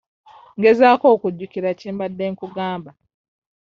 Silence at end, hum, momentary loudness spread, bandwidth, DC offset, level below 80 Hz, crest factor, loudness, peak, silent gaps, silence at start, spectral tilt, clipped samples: 0.7 s; none; 14 LU; 6.8 kHz; under 0.1%; -64 dBFS; 18 dB; -18 LUFS; -2 dBFS; none; 0.55 s; -4.5 dB/octave; under 0.1%